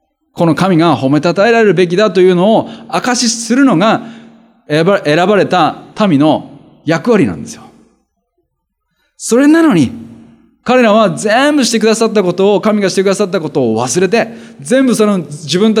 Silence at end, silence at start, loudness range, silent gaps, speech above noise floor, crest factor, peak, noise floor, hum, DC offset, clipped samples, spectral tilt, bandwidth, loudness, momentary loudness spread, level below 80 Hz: 0 s; 0.35 s; 4 LU; none; 58 dB; 12 dB; 0 dBFS; -68 dBFS; none; under 0.1%; under 0.1%; -5 dB/octave; 15 kHz; -11 LUFS; 8 LU; -56 dBFS